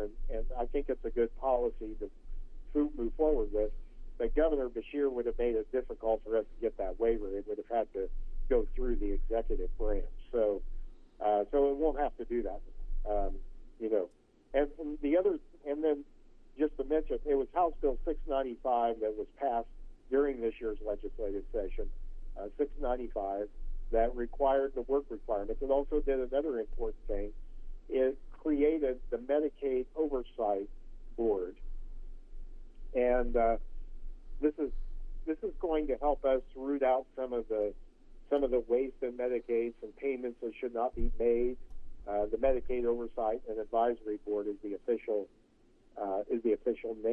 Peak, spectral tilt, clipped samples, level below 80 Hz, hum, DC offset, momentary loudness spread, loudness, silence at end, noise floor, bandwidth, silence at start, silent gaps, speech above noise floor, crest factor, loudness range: -16 dBFS; -9 dB/octave; under 0.1%; -44 dBFS; none; under 0.1%; 13 LU; -34 LUFS; 0 s; -64 dBFS; 3.5 kHz; 0 s; none; 32 dB; 18 dB; 3 LU